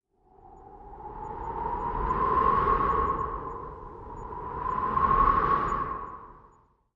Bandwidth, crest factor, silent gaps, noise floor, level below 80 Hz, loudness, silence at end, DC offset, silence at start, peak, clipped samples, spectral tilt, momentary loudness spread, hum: 7.2 kHz; 18 dB; none; -61 dBFS; -40 dBFS; -27 LUFS; 0.55 s; under 0.1%; 0.45 s; -10 dBFS; under 0.1%; -8 dB/octave; 20 LU; none